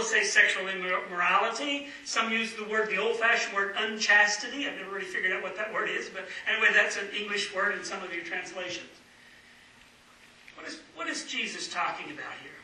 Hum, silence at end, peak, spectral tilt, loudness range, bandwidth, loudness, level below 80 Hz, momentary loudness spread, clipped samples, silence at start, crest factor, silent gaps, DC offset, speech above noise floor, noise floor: none; 0 s; -8 dBFS; -1 dB/octave; 11 LU; 12 kHz; -27 LUFS; -74 dBFS; 15 LU; under 0.1%; 0 s; 22 dB; none; under 0.1%; 27 dB; -56 dBFS